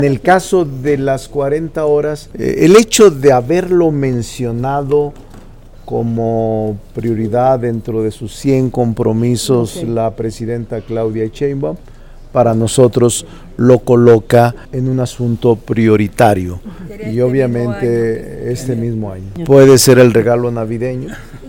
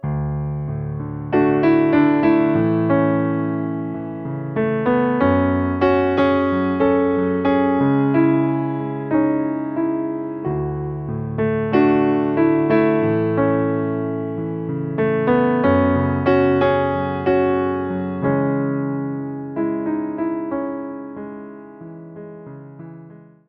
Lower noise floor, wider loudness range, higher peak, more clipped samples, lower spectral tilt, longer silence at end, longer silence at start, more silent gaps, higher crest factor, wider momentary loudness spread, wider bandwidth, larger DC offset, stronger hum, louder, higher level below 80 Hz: second, -35 dBFS vs -42 dBFS; about the same, 6 LU vs 6 LU; first, 0 dBFS vs -4 dBFS; first, 0.9% vs under 0.1%; second, -6 dB/octave vs -10.5 dB/octave; second, 0 s vs 0.25 s; about the same, 0 s vs 0.05 s; neither; about the same, 12 dB vs 16 dB; about the same, 13 LU vs 12 LU; first, 17.5 kHz vs 5.2 kHz; neither; neither; first, -13 LUFS vs -19 LUFS; first, -36 dBFS vs -46 dBFS